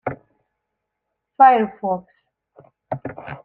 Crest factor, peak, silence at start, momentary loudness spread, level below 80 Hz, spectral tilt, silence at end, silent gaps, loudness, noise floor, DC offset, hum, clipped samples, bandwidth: 20 dB; -2 dBFS; 0.05 s; 19 LU; -64 dBFS; -8.5 dB/octave; 0.1 s; none; -18 LUFS; -79 dBFS; under 0.1%; none; under 0.1%; 4.1 kHz